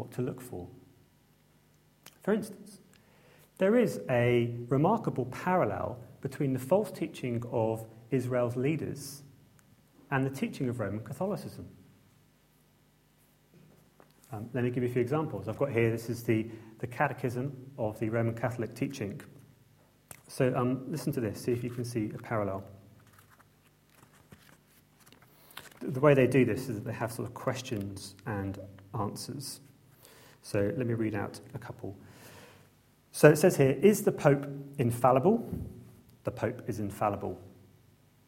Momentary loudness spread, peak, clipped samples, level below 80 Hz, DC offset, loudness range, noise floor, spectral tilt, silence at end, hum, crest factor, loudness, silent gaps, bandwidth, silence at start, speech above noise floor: 19 LU; -4 dBFS; under 0.1%; -64 dBFS; under 0.1%; 12 LU; -65 dBFS; -6.5 dB/octave; 0.8 s; 50 Hz at -60 dBFS; 28 dB; -31 LUFS; none; 16.5 kHz; 0 s; 35 dB